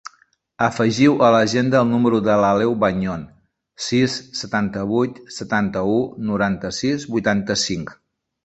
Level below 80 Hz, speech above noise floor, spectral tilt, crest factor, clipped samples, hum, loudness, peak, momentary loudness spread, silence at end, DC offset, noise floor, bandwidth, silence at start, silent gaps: -50 dBFS; 40 dB; -5.5 dB/octave; 18 dB; under 0.1%; none; -19 LUFS; -2 dBFS; 10 LU; 0.5 s; under 0.1%; -59 dBFS; 8.2 kHz; 0.05 s; none